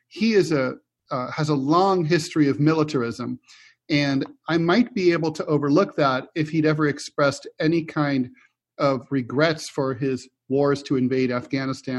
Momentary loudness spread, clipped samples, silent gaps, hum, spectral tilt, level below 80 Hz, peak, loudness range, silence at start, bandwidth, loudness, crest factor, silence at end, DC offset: 8 LU; under 0.1%; none; none; -6.5 dB/octave; -64 dBFS; -4 dBFS; 3 LU; 0.15 s; 12 kHz; -23 LUFS; 18 dB; 0 s; under 0.1%